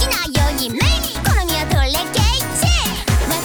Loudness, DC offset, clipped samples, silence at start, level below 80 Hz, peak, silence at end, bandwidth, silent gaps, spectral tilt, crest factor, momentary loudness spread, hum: -17 LUFS; under 0.1%; under 0.1%; 0 s; -22 dBFS; -2 dBFS; 0 s; over 20 kHz; none; -3.5 dB/octave; 14 dB; 2 LU; none